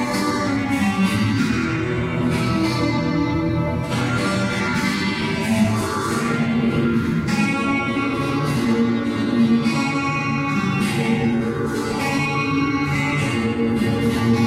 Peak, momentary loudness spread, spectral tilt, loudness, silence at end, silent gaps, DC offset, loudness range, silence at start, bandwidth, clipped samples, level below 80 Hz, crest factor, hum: -6 dBFS; 3 LU; -6 dB/octave; -20 LUFS; 0 s; none; under 0.1%; 1 LU; 0 s; 15 kHz; under 0.1%; -42 dBFS; 12 dB; none